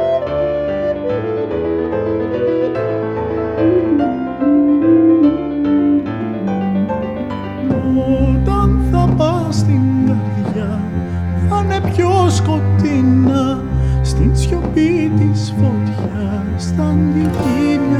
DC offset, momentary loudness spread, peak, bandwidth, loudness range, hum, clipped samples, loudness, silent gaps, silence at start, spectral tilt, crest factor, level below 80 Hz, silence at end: under 0.1%; 7 LU; -2 dBFS; 11 kHz; 3 LU; none; under 0.1%; -16 LUFS; none; 0 s; -8 dB/octave; 12 dB; -26 dBFS; 0 s